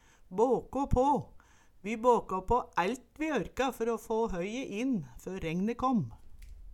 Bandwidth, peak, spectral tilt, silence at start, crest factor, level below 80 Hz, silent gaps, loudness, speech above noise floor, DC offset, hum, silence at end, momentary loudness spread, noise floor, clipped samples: 16.5 kHz; -12 dBFS; -6.5 dB/octave; 0.3 s; 20 dB; -46 dBFS; none; -32 LUFS; 25 dB; under 0.1%; none; 0 s; 11 LU; -56 dBFS; under 0.1%